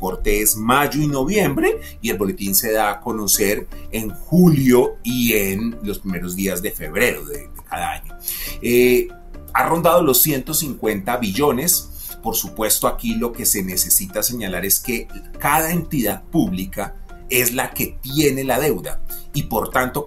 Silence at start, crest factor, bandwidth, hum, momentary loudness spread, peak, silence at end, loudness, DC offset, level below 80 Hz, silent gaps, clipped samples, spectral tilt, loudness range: 0 s; 18 dB; 16.5 kHz; none; 12 LU; -2 dBFS; 0 s; -19 LUFS; under 0.1%; -34 dBFS; none; under 0.1%; -4 dB/octave; 3 LU